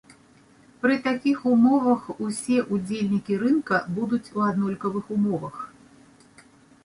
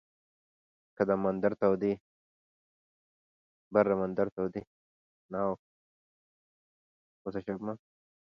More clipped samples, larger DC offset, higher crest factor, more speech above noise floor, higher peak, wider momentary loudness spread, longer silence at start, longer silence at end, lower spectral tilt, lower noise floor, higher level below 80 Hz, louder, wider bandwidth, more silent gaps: neither; neither; second, 16 dB vs 24 dB; second, 32 dB vs over 60 dB; about the same, -8 dBFS vs -10 dBFS; second, 10 LU vs 13 LU; second, 0.85 s vs 1 s; first, 1.2 s vs 0.5 s; second, -6.5 dB/octave vs -9.5 dB/octave; second, -55 dBFS vs under -90 dBFS; about the same, -64 dBFS vs -68 dBFS; first, -24 LUFS vs -32 LUFS; first, 11.5 kHz vs 6.2 kHz; second, none vs 2.00-3.71 s, 4.32-4.36 s, 4.67-5.29 s, 5.59-7.25 s